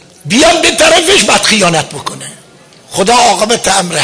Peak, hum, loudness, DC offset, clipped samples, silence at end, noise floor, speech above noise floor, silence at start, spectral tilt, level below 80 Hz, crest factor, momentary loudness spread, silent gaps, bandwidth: 0 dBFS; none; -7 LUFS; under 0.1%; under 0.1%; 0 s; -37 dBFS; 28 dB; 0.25 s; -2 dB/octave; -38 dBFS; 10 dB; 15 LU; none; 11 kHz